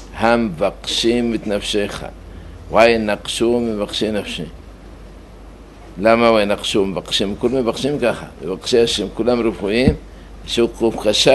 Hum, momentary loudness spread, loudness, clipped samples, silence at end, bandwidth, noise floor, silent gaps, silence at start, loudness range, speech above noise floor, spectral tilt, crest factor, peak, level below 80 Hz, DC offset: none; 14 LU; -18 LUFS; under 0.1%; 0 s; 12 kHz; -38 dBFS; none; 0 s; 2 LU; 21 dB; -4.5 dB/octave; 18 dB; 0 dBFS; -36 dBFS; under 0.1%